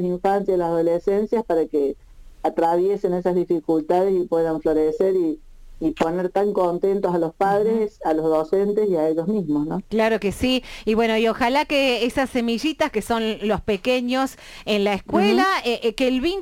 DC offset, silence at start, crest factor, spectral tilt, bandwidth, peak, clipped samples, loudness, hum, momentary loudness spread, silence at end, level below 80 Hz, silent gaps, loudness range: under 0.1%; 0 s; 12 dB; -5.5 dB/octave; 17 kHz; -8 dBFS; under 0.1%; -21 LUFS; none; 5 LU; 0 s; -46 dBFS; none; 1 LU